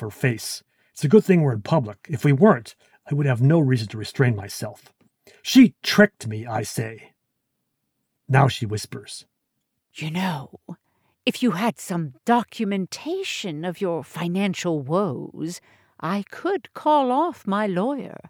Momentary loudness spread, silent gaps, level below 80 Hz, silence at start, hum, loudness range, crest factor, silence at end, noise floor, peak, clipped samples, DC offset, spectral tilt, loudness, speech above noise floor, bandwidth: 16 LU; none; -64 dBFS; 0 s; none; 7 LU; 20 dB; 0 s; -77 dBFS; -4 dBFS; under 0.1%; under 0.1%; -6 dB/octave; -22 LUFS; 55 dB; 19 kHz